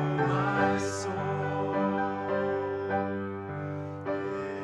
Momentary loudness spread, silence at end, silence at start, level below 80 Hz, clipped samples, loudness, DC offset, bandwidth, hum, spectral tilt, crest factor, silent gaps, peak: 9 LU; 0 s; 0 s; -64 dBFS; under 0.1%; -30 LUFS; under 0.1%; 11.5 kHz; none; -6.5 dB/octave; 16 dB; none; -14 dBFS